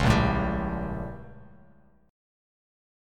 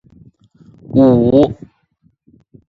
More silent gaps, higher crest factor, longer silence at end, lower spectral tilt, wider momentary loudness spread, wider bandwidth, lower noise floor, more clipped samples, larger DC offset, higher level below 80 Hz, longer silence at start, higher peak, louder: neither; first, 22 dB vs 16 dB; second, 1 s vs 1.15 s; second, -6.5 dB/octave vs -10.5 dB/octave; first, 21 LU vs 10 LU; first, 14 kHz vs 4.9 kHz; about the same, -58 dBFS vs -59 dBFS; neither; neither; about the same, -38 dBFS vs -42 dBFS; second, 0 s vs 0.9 s; second, -8 dBFS vs 0 dBFS; second, -28 LUFS vs -12 LUFS